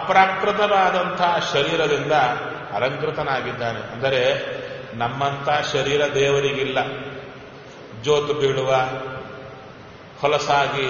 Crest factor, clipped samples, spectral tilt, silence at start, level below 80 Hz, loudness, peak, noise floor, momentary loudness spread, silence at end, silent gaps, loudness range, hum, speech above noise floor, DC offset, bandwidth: 20 dB; under 0.1%; -2.5 dB/octave; 0 s; -54 dBFS; -21 LUFS; -2 dBFS; -41 dBFS; 19 LU; 0 s; none; 4 LU; none; 21 dB; under 0.1%; 7 kHz